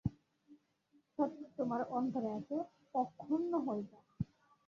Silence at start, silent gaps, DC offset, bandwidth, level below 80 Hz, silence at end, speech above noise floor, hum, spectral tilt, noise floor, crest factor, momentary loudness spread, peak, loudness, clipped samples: 0.05 s; none; under 0.1%; 7.2 kHz; -64 dBFS; 0.45 s; 36 dB; none; -9 dB/octave; -74 dBFS; 20 dB; 9 LU; -20 dBFS; -40 LUFS; under 0.1%